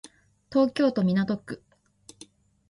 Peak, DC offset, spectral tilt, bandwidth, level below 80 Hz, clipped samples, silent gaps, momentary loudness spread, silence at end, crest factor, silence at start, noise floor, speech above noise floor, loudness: -10 dBFS; under 0.1%; -7 dB/octave; 11.5 kHz; -64 dBFS; under 0.1%; none; 16 LU; 1.15 s; 18 dB; 0.5 s; -55 dBFS; 31 dB; -25 LUFS